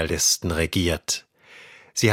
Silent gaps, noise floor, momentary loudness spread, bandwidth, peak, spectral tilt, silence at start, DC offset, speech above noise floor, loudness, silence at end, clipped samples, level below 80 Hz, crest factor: none; -49 dBFS; 9 LU; 16.5 kHz; -4 dBFS; -3 dB/octave; 0 s; under 0.1%; 25 dB; -23 LUFS; 0 s; under 0.1%; -40 dBFS; 20 dB